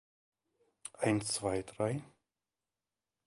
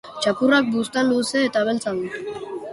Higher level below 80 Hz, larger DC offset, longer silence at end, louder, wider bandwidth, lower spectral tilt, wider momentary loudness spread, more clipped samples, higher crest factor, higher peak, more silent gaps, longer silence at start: about the same, -66 dBFS vs -62 dBFS; neither; first, 1.2 s vs 0 s; second, -35 LUFS vs -21 LUFS; about the same, 11.5 kHz vs 11.5 kHz; about the same, -4.5 dB/octave vs -4 dB/octave; about the same, 14 LU vs 13 LU; neither; first, 22 dB vs 16 dB; second, -18 dBFS vs -6 dBFS; neither; first, 0.85 s vs 0.05 s